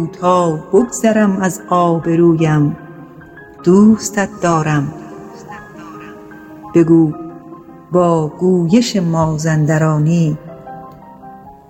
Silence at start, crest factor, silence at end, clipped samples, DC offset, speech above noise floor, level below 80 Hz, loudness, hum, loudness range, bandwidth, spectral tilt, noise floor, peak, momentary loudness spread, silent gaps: 0 s; 14 dB; 0.2 s; under 0.1%; under 0.1%; 24 dB; -48 dBFS; -14 LUFS; none; 3 LU; 16 kHz; -6.5 dB/octave; -37 dBFS; 0 dBFS; 22 LU; none